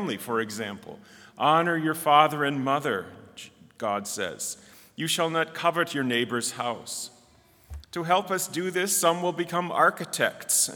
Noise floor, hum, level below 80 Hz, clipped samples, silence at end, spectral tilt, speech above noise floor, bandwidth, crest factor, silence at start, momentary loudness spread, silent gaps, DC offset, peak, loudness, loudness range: -58 dBFS; none; -60 dBFS; under 0.1%; 0 s; -3 dB/octave; 32 dB; over 20 kHz; 24 dB; 0 s; 19 LU; none; under 0.1%; -4 dBFS; -26 LUFS; 4 LU